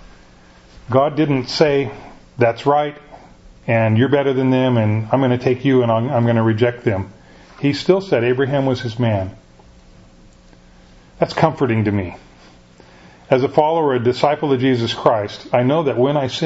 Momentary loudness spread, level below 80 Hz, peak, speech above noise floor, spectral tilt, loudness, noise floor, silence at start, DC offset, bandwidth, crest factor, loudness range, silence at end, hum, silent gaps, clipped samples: 7 LU; -50 dBFS; 0 dBFS; 30 dB; -7.5 dB/octave; -17 LUFS; -46 dBFS; 0.9 s; under 0.1%; 8 kHz; 18 dB; 6 LU; 0 s; none; none; under 0.1%